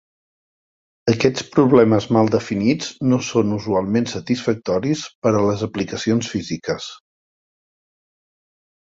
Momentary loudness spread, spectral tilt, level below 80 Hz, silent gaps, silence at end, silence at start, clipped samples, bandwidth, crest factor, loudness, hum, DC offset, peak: 10 LU; -6 dB/octave; -52 dBFS; 5.15-5.22 s; 1.95 s; 1.05 s; under 0.1%; 7.8 kHz; 18 dB; -19 LUFS; none; under 0.1%; -2 dBFS